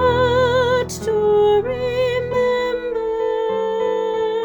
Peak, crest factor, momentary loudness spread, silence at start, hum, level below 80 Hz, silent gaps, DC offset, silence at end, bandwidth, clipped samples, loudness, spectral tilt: -6 dBFS; 12 dB; 6 LU; 0 s; none; -42 dBFS; none; under 0.1%; 0 s; over 20 kHz; under 0.1%; -19 LUFS; -5 dB/octave